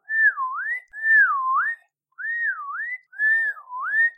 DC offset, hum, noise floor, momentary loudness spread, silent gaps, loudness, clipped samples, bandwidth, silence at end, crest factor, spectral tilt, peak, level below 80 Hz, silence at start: under 0.1%; none; -42 dBFS; 14 LU; none; -21 LUFS; under 0.1%; 8.4 kHz; 0.05 s; 14 dB; 2 dB/octave; -10 dBFS; -86 dBFS; 0.1 s